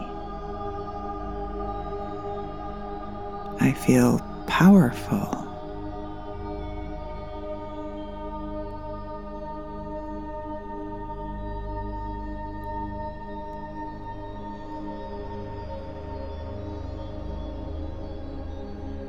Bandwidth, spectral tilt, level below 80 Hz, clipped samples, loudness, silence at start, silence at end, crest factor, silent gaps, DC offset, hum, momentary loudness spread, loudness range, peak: 16.5 kHz; -7 dB/octave; -40 dBFS; under 0.1%; -29 LUFS; 0 s; 0 s; 24 dB; none; 0.6%; 50 Hz at -45 dBFS; 14 LU; 14 LU; -4 dBFS